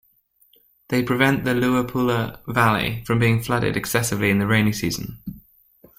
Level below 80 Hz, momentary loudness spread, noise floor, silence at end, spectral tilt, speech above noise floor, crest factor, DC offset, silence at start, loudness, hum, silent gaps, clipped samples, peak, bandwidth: -48 dBFS; 7 LU; -61 dBFS; 0.6 s; -5.5 dB/octave; 41 dB; 18 dB; under 0.1%; 0.9 s; -21 LUFS; none; none; under 0.1%; -4 dBFS; 16.5 kHz